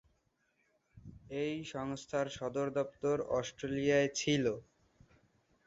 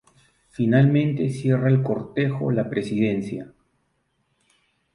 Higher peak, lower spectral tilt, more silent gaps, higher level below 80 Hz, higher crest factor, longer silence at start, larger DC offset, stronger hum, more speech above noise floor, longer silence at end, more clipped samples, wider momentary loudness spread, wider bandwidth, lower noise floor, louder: second, -18 dBFS vs -6 dBFS; second, -4.5 dB/octave vs -8.5 dB/octave; neither; second, -66 dBFS vs -58 dBFS; about the same, 20 dB vs 18 dB; first, 0.95 s vs 0.6 s; neither; neither; second, 43 dB vs 49 dB; second, 1.05 s vs 1.5 s; neither; about the same, 11 LU vs 10 LU; second, 7.6 kHz vs 11 kHz; first, -77 dBFS vs -70 dBFS; second, -35 LUFS vs -22 LUFS